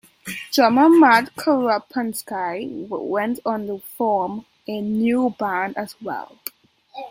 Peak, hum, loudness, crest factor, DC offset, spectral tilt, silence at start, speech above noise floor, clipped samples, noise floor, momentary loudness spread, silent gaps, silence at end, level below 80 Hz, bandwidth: -2 dBFS; none; -20 LUFS; 18 dB; under 0.1%; -4.5 dB/octave; 0.25 s; 28 dB; under 0.1%; -47 dBFS; 19 LU; none; 0 s; -66 dBFS; 16.5 kHz